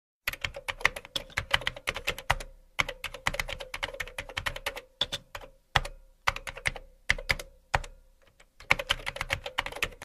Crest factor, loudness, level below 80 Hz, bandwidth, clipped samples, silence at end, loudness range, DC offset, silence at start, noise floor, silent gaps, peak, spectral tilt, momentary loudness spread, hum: 32 dB; -32 LUFS; -44 dBFS; 15.5 kHz; under 0.1%; 0 s; 2 LU; under 0.1%; 0.25 s; -60 dBFS; none; -2 dBFS; -2 dB/octave; 9 LU; none